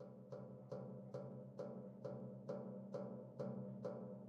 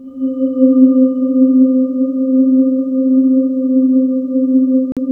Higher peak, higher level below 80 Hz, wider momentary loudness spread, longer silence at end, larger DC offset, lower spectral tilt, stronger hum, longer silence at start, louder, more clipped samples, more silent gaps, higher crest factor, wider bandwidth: second, -34 dBFS vs 0 dBFS; second, -88 dBFS vs -58 dBFS; about the same, 5 LU vs 6 LU; about the same, 0 s vs 0 s; neither; second, -9.5 dB/octave vs -11.5 dB/octave; neither; about the same, 0 s vs 0 s; second, -52 LUFS vs -13 LUFS; neither; second, none vs 4.92-4.96 s; first, 18 dB vs 12 dB; first, 7.6 kHz vs 1.3 kHz